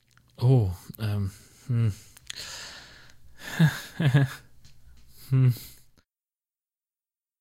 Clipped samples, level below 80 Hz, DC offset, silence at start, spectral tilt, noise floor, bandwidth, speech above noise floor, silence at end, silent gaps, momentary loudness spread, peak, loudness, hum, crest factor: under 0.1%; -56 dBFS; under 0.1%; 0.4 s; -6.5 dB/octave; under -90 dBFS; 16 kHz; over 66 dB; 1.7 s; none; 21 LU; -8 dBFS; -27 LUFS; none; 20 dB